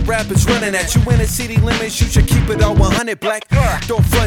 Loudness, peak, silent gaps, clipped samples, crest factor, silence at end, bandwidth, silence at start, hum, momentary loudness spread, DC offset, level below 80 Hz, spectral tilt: -15 LUFS; -2 dBFS; none; under 0.1%; 12 dB; 0 s; 18 kHz; 0 s; none; 3 LU; under 0.1%; -20 dBFS; -5 dB/octave